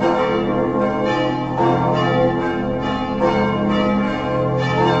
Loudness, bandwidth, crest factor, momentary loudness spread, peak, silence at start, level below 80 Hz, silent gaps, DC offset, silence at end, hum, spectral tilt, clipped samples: -18 LUFS; 8 kHz; 14 dB; 4 LU; -4 dBFS; 0 s; -40 dBFS; none; 0.3%; 0 s; none; -7.5 dB/octave; under 0.1%